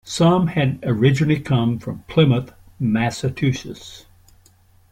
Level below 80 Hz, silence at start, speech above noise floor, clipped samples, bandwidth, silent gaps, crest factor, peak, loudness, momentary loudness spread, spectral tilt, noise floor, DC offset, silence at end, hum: -48 dBFS; 0.05 s; 35 dB; under 0.1%; 13 kHz; none; 18 dB; -2 dBFS; -19 LUFS; 13 LU; -6.5 dB/octave; -54 dBFS; under 0.1%; 0.9 s; none